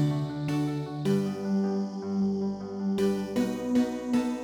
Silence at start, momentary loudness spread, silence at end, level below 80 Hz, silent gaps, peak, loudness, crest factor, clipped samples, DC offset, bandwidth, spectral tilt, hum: 0 s; 4 LU; 0 s; -60 dBFS; none; -14 dBFS; -29 LUFS; 14 dB; under 0.1%; under 0.1%; 14.5 kHz; -7.5 dB/octave; none